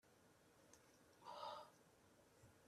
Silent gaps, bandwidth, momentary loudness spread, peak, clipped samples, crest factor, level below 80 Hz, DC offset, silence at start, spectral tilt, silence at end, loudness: none; 13.5 kHz; 15 LU; -40 dBFS; under 0.1%; 22 dB; under -90 dBFS; under 0.1%; 0.05 s; -3 dB/octave; 0 s; -57 LUFS